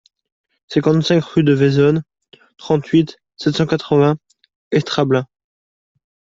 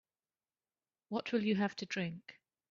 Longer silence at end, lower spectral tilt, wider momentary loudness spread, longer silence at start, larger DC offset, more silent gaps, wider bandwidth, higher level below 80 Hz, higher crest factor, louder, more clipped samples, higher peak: first, 1.15 s vs 0.4 s; first, -7 dB/octave vs -4.5 dB/octave; second, 9 LU vs 14 LU; second, 0.7 s vs 1.1 s; neither; first, 4.56-4.71 s vs none; about the same, 7.6 kHz vs 7.2 kHz; first, -54 dBFS vs -80 dBFS; about the same, 16 dB vs 18 dB; first, -17 LUFS vs -37 LUFS; neither; first, -2 dBFS vs -20 dBFS